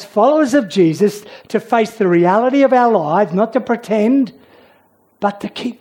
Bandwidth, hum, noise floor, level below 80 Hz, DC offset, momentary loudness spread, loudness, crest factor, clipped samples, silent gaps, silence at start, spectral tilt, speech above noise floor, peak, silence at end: 17 kHz; none; -54 dBFS; -66 dBFS; under 0.1%; 10 LU; -15 LUFS; 14 dB; under 0.1%; none; 0 s; -6.5 dB/octave; 40 dB; -2 dBFS; 0.05 s